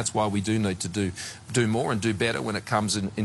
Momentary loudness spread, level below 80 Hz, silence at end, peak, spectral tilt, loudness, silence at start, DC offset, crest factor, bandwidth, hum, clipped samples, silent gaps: 4 LU; -56 dBFS; 0 s; -10 dBFS; -4.5 dB/octave; -26 LUFS; 0 s; under 0.1%; 16 dB; 12.5 kHz; none; under 0.1%; none